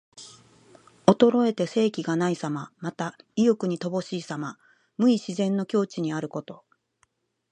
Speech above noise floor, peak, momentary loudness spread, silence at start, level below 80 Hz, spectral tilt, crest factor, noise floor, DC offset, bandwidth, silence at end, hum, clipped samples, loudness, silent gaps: 45 dB; 0 dBFS; 17 LU; 0.15 s; -68 dBFS; -6.5 dB/octave; 26 dB; -70 dBFS; under 0.1%; 9.8 kHz; 0.95 s; none; under 0.1%; -25 LUFS; none